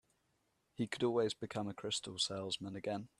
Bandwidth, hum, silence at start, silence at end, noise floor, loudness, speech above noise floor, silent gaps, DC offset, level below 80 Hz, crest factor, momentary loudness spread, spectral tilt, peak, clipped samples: 12.5 kHz; none; 0.8 s; 0.15 s; -80 dBFS; -39 LUFS; 41 dB; none; under 0.1%; -76 dBFS; 18 dB; 7 LU; -4 dB/octave; -22 dBFS; under 0.1%